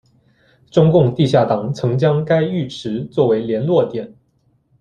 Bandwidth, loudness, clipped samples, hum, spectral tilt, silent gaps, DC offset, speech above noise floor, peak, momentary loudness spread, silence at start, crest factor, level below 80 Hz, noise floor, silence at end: 9.2 kHz; -17 LUFS; under 0.1%; none; -8 dB/octave; none; under 0.1%; 45 dB; -2 dBFS; 10 LU; 0.75 s; 16 dB; -54 dBFS; -61 dBFS; 0.75 s